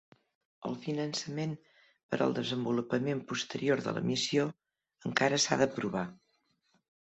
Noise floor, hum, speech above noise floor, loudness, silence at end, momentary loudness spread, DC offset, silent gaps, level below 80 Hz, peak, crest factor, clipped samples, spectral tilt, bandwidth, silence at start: -75 dBFS; none; 43 dB; -32 LUFS; 0.85 s; 11 LU; under 0.1%; 2.03-2.09 s; -72 dBFS; -10 dBFS; 24 dB; under 0.1%; -4 dB/octave; 8.2 kHz; 0.6 s